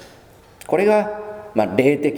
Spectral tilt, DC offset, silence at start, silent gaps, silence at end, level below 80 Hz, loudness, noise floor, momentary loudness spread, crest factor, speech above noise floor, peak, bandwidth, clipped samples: -6.5 dB/octave; under 0.1%; 0 s; none; 0 s; -58 dBFS; -19 LUFS; -47 dBFS; 10 LU; 20 dB; 30 dB; 0 dBFS; 19.5 kHz; under 0.1%